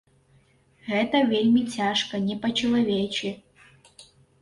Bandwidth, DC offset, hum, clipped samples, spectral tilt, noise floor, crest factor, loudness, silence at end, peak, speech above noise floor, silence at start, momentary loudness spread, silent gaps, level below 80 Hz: 11.5 kHz; under 0.1%; none; under 0.1%; -5 dB/octave; -61 dBFS; 16 dB; -24 LUFS; 0.4 s; -10 dBFS; 37 dB; 0.85 s; 10 LU; none; -60 dBFS